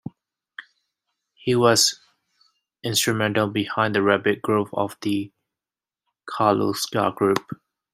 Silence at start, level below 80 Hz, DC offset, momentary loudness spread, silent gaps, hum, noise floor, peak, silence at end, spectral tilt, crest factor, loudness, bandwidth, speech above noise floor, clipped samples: 0.05 s; -64 dBFS; under 0.1%; 22 LU; none; none; under -90 dBFS; -2 dBFS; 0.4 s; -3.5 dB/octave; 20 dB; -21 LUFS; 16 kHz; over 69 dB; under 0.1%